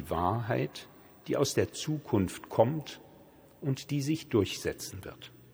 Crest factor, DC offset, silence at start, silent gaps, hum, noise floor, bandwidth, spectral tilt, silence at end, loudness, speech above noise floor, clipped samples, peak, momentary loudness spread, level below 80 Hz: 22 dB; under 0.1%; 0 s; none; none; -56 dBFS; over 20 kHz; -5.5 dB/octave; 0.1 s; -32 LUFS; 25 dB; under 0.1%; -10 dBFS; 18 LU; -62 dBFS